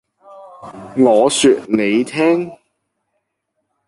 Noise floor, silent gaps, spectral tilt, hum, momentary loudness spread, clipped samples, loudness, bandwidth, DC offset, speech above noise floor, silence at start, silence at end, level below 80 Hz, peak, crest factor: -72 dBFS; none; -4 dB/octave; none; 18 LU; under 0.1%; -14 LUFS; 11.5 kHz; under 0.1%; 58 dB; 0.3 s; 1.35 s; -60 dBFS; -2 dBFS; 16 dB